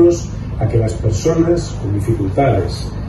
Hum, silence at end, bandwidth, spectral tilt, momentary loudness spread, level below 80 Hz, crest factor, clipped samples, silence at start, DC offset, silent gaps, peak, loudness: none; 0 s; 12 kHz; -7.5 dB/octave; 7 LU; -28 dBFS; 14 dB; under 0.1%; 0 s; under 0.1%; none; 0 dBFS; -17 LUFS